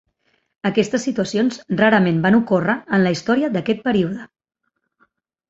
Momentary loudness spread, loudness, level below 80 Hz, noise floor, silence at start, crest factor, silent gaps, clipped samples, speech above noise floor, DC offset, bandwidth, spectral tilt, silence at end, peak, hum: 6 LU; -18 LUFS; -58 dBFS; -66 dBFS; 0.65 s; 18 dB; none; under 0.1%; 48 dB; under 0.1%; 8 kHz; -6 dB/octave; 1.25 s; -2 dBFS; none